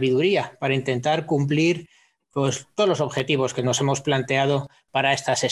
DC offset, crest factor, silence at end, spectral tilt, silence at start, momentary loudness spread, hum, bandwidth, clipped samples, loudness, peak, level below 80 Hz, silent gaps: under 0.1%; 16 dB; 0 s; -4.5 dB/octave; 0 s; 5 LU; none; 12 kHz; under 0.1%; -23 LUFS; -8 dBFS; -62 dBFS; none